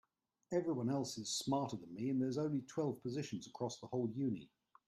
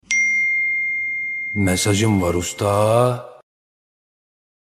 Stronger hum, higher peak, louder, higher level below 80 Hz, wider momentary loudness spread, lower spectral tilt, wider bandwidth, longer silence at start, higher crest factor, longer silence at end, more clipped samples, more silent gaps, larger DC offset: neither; second, -24 dBFS vs 0 dBFS; second, -41 LUFS vs -18 LUFS; second, -78 dBFS vs -48 dBFS; about the same, 7 LU vs 6 LU; about the same, -5.5 dB/octave vs -4.5 dB/octave; second, 13 kHz vs 15 kHz; first, 0.5 s vs 0.1 s; about the same, 18 dB vs 20 dB; second, 0.4 s vs 1.45 s; neither; neither; neither